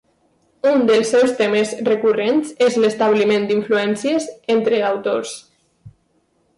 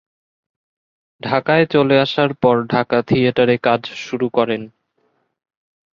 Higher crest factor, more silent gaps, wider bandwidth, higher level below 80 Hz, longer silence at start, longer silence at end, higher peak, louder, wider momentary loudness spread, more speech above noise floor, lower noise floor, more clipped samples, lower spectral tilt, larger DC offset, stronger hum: second, 12 dB vs 18 dB; neither; first, 11.5 kHz vs 7.2 kHz; second, -64 dBFS vs -56 dBFS; second, 0.65 s vs 1.25 s; second, 0.7 s vs 1.25 s; second, -8 dBFS vs -2 dBFS; about the same, -17 LUFS vs -17 LUFS; about the same, 6 LU vs 8 LU; about the same, 46 dB vs 49 dB; about the same, -63 dBFS vs -65 dBFS; neither; second, -4.5 dB/octave vs -7 dB/octave; neither; neither